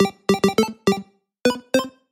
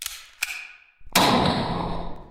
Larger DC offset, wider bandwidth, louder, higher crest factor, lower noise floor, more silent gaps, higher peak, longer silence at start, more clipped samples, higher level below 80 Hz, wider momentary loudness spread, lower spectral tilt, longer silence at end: neither; about the same, 17 kHz vs 17 kHz; about the same, -21 LUFS vs -23 LUFS; about the same, 18 dB vs 22 dB; second, -38 dBFS vs -44 dBFS; neither; about the same, -4 dBFS vs -2 dBFS; about the same, 0 s vs 0 s; neither; second, -56 dBFS vs -42 dBFS; second, 4 LU vs 16 LU; first, -5 dB/octave vs -3.5 dB/octave; first, 0.25 s vs 0 s